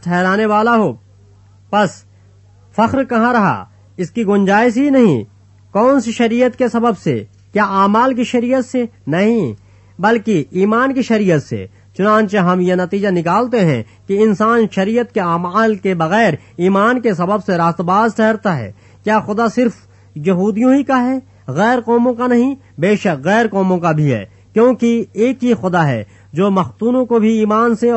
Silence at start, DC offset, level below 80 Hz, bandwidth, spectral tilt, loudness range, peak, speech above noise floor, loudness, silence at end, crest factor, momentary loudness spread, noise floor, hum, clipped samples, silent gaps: 0.05 s; under 0.1%; -56 dBFS; 8.4 kHz; -7 dB/octave; 2 LU; 0 dBFS; 32 dB; -15 LUFS; 0 s; 14 dB; 8 LU; -45 dBFS; none; under 0.1%; none